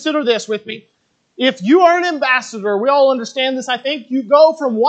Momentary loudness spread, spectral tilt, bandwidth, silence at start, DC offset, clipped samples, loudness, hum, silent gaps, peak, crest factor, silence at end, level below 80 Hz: 10 LU; -4 dB/octave; 8.8 kHz; 0 s; under 0.1%; under 0.1%; -15 LUFS; none; none; 0 dBFS; 14 dB; 0 s; -76 dBFS